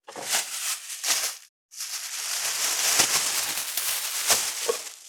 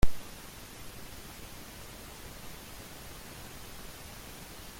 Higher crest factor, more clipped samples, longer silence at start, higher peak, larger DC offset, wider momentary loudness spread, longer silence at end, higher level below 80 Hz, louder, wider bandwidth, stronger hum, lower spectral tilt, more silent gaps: about the same, 24 dB vs 22 dB; neither; about the same, 0.1 s vs 0 s; first, -4 dBFS vs -10 dBFS; neither; first, 11 LU vs 1 LU; about the same, 0 s vs 0 s; second, -76 dBFS vs -42 dBFS; first, -24 LUFS vs -45 LUFS; first, over 20 kHz vs 16.5 kHz; neither; second, 2 dB/octave vs -4 dB/octave; first, 1.49-1.69 s vs none